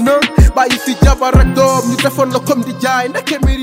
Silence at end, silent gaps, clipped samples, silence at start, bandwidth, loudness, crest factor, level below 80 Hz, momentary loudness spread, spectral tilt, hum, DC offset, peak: 0 s; none; under 0.1%; 0 s; 16.5 kHz; -12 LUFS; 12 dB; -16 dBFS; 5 LU; -5.5 dB/octave; none; under 0.1%; 0 dBFS